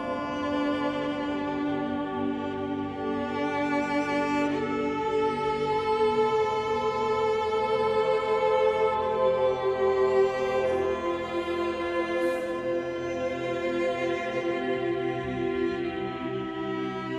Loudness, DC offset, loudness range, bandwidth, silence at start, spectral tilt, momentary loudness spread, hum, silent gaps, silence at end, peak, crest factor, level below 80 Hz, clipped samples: -27 LUFS; under 0.1%; 4 LU; 11 kHz; 0 s; -6 dB/octave; 7 LU; none; none; 0 s; -12 dBFS; 14 dB; -58 dBFS; under 0.1%